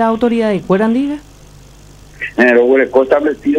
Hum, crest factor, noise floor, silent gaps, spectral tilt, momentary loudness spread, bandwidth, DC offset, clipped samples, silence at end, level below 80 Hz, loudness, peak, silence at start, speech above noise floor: 50 Hz at -45 dBFS; 12 dB; -39 dBFS; none; -7 dB/octave; 12 LU; 11 kHz; under 0.1%; under 0.1%; 0 s; -44 dBFS; -12 LUFS; 0 dBFS; 0 s; 27 dB